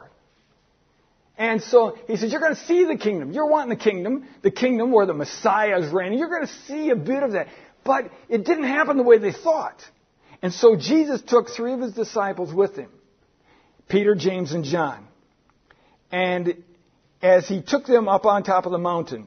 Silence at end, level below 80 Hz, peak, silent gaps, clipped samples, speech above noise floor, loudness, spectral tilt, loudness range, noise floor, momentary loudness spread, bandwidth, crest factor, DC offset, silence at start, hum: 0.05 s; -68 dBFS; -2 dBFS; none; under 0.1%; 42 dB; -21 LUFS; -5.5 dB/octave; 5 LU; -63 dBFS; 10 LU; 6.6 kHz; 20 dB; under 0.1%; 1.4 s; none